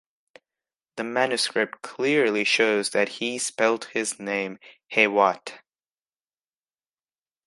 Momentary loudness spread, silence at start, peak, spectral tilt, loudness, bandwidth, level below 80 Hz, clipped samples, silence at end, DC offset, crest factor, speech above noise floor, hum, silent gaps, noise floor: 11 LU; 0.95 s; -4 dBFS; -2.5 dB/octave; -23 LUFS; 11.5 kHz; -78 dBFS; under 0.1%; 1.9 s; under 0.1%; 22 dB; over 66 dB; none; none; under -90 dBFS